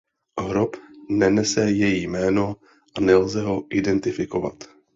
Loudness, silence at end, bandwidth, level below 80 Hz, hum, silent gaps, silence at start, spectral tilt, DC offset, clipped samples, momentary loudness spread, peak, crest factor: -22 LUFS; 0.3 s; 7.8 kHz; -50 dBFS; none; none; 0.35 s; -5.5 dB/octave; under 0.1%; under 0.1%; 13 LU; -4 dBFS; 18 dB